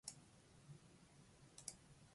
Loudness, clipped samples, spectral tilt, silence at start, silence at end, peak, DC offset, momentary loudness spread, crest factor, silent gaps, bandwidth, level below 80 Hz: -60 LUFS; under 0.1%; -2.5 dB/octave; 0.05 s; 0 s; -32 dBFS; under 0.1%; 12 LU; 30 dB; none; 11.5 kHz; -78 dBFS